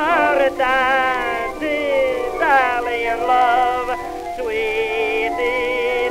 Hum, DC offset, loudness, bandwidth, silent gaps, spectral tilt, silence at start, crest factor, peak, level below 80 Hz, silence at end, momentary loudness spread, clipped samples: none; under 0.1%; -18 LUFS; 16 kHz; none; -3.5 dB/octave; 0 s; 16 dB; -2 dBFS; -44 dBFS; 0 s; 7 LU; under 0.1%